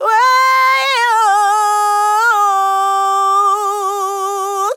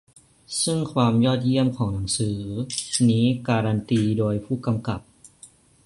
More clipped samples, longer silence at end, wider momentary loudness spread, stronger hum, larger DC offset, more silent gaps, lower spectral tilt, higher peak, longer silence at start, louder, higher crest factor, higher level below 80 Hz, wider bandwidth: neither; second, 0 s vs 0.4 s; about the same, 7 LU vs 9 LU; neither; neither; neither; second, 3.5 dB/octave vs -5.5 dB/octave; about the same, -4 dBFS vs -6 dBFS; second, 0 s vs 0.5 s; first, -13 LUFS vs -23 LUFS; second, 10 dB vs 18 dB; second, under -90 dBFS vs -50 dBFS; first, 18 kHz vs 11.5 kHz